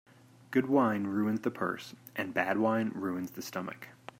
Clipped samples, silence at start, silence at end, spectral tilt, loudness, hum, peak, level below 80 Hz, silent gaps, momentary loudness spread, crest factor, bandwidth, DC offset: under 0.1%; 0.5 s; 0.3 s; -6 dB/octave; -32 LUFS; none; -14 dBFS; -78 dBFS; none; 13 LU; 20 dB; 16 kHz; under 0.1%